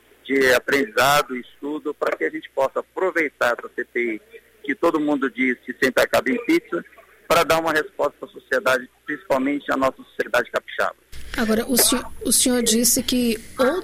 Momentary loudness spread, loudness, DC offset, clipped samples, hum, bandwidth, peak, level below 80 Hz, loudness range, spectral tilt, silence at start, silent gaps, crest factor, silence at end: 12 LU; -21 LUFS; under 0.1%; under 0.1%; none; 16 kHz; -6 dBFS; -48 dBFS; 4 LU; -2.5 dB/octave; 0.25 s; none; 16 dB; 0 s